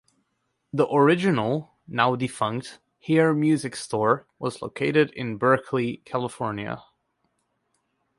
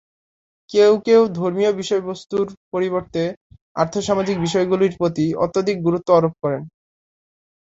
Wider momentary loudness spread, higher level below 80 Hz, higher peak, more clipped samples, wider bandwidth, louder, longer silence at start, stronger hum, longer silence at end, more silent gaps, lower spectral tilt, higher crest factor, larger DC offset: first, 13 LU vs 10 LU; second, -64 dBFS vs -56 dBFS; second, -6 dBFS vs -2 dBFS; neither; first, 11.5 kHz vs 8 kHz; second, -24 LUFS vs -19 LUFS; about the same, 0.75 s vs 0.7 s; neither; first, 1.4 s vs 0.95 s; second, none vs 2.57-2.71 s, 3.37-3.50 s, 3.61-3.75 s; about the same, -6 dB/octave vs -6 dB/octave; about the same, 20 dB vs 18 dB; neither